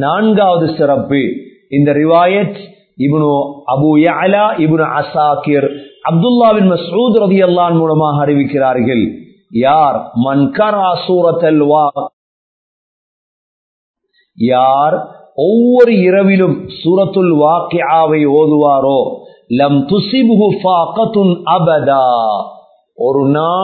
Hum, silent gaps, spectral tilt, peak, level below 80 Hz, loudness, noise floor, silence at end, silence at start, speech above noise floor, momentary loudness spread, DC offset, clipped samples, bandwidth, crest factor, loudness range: none; 12.13-13.94 s; -10.5 dB/octave; 0 dBFS; -54 dBFS; -11 LUFS; under -90 dBFS; 0 s; 0 s; over 79 dB; 8 LU; under 0.1%; under 0.1%; 4.6 kHz; 12 dB; 4 LU